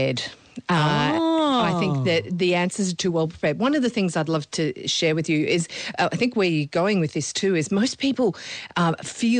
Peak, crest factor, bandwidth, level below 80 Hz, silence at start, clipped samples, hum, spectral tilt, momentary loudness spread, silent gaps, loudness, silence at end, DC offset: -12 dBFS; 12 dB; 9.8 kHz; -60 dBFS; 0 s; under 0.1%; none; -5 dB/octave; 5 LU; none; -22 LUFS; 0 s; under 0.1%